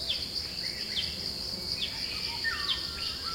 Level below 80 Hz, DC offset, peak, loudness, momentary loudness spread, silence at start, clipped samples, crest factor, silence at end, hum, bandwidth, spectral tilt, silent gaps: -52 dBFS; under 0.1%; -18 dBFS; -31 LUFS; 3 LU; 0 s; under 0.1%; 16 dB; 0 s; none; 16.5 kHz; -1.5 dB/octave; none